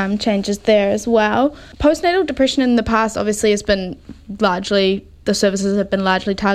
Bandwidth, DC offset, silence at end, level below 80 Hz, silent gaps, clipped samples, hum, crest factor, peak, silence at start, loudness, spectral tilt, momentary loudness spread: 14.5 kHz; under 0.1%; 0 s; -40 dBFS; none; under 0.1%; none; 16 dB; 0 dBFS; 0 s; -17 LUFS; -4.5 dB/octave; 5 LU